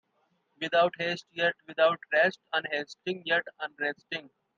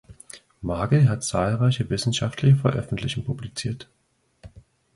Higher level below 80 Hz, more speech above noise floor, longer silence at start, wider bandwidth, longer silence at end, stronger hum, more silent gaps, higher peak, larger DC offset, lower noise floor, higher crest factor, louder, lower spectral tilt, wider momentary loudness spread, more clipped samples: second, -80 dBFS vs -46 dBFS; first, 44 dB vs 40 dB; first, 0.6 s vs 0.1 s; second, 7.4 kHz vs 11.5 kHz; second, 0.3 s vs 0.45 s; neither; neither; second, -12 dBFS vs -8 dBFS; neither; first, -73 dBFS vs -62 dBFS; about the same, 18 dB vs 16 dB; second, -29 LUFS vs -23 LUFS; second, -4.5 dB/octave vs -6 dB/octave; second, 12 LU vs 16 LU; neither